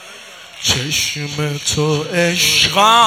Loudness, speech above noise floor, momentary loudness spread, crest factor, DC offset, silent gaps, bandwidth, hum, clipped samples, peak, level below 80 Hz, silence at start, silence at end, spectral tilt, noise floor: -15 LUFS; 22 dB; 16 LU; 16 dB; under 0.1%; none; 17 kHz; none; under 0.1%; 0 dBFS; -46 dBFS; 0 s; 0 s; -2.5 dB/octave; -36 dBFS